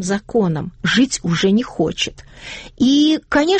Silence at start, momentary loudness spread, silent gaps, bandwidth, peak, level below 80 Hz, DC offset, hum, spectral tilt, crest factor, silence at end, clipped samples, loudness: 0 s; 17 LU; none; 8.6 kHz; -4 dBFS; -44 dBFS; under 0.1%; none; -4.5 dB/octave; 14 dB; 0 s; under 0.1%; -17 LUFS